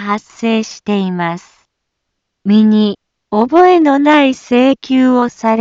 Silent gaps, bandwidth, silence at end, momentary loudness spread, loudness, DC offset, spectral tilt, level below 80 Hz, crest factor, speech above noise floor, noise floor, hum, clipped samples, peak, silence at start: none; 7.6 kHz; 0 s; 11 LU; -12 LUFS; under 0.1%; -6 dB/octave; -58 dBFS; 12 dB; 62 dB; -73 dBFS; none; under 0.1%; 0 dBFS; 0 s